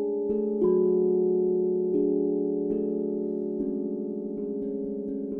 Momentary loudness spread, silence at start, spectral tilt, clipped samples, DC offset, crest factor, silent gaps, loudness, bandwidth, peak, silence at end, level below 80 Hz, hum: 9 LU; 0 s; -13.5 dB/octave; under 0.1%; under 0.1%; 14 dB; none; -27 LUFS; 1.7 kHz; -14 dBFS; 0 s; -62 dBFS; none